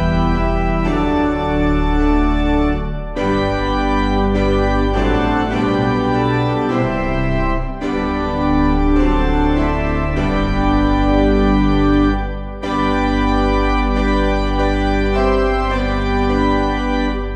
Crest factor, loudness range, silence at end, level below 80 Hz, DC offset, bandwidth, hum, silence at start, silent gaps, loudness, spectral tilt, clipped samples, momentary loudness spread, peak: 14 dB; 2 LU; 0 s; -20 dBFS; under 0.1%; 8.4 kHz; none; 0 s; none; -17 LUFS; -7.5 dB/octave; under 0.1%; 5 LU; -2 dBFS